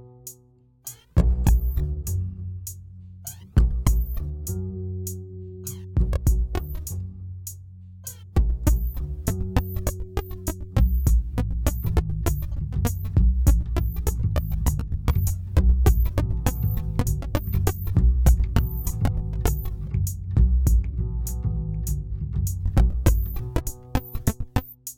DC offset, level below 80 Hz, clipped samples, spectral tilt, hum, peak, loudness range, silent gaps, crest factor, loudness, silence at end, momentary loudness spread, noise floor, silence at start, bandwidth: under 0.1%; -24 dBFS; under 0.1%; -6.5 dB/octave; none; -4 dBFS; 5 LU; none; 18 dB; -25 LUFS; 0.05 s; 15 LU; -56 dBFS; 0 s; 17.5 kHz